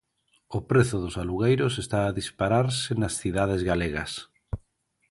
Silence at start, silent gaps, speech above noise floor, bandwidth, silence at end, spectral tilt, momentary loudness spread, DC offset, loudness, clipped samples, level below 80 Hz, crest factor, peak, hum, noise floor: 0.5 s; none; 45 dB; 11.5 kHz; 0.55 s; -5.5 dB/octave; 14 LU; under 0.1%; -26 LUFS; under 0.1%; -44 dBFS; 20 dB; -8 dBFS; none; -70 dBFS